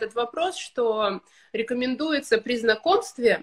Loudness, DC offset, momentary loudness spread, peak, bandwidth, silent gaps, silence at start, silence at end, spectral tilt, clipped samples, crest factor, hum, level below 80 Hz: -25 LUFS; under 0.1%; 7 LU; -6 dBFS; 12.5 kHz; none; 0 s; 0 s; -3.5 dB/octave; under 0.1%; 18 dB; none; -64 dBFS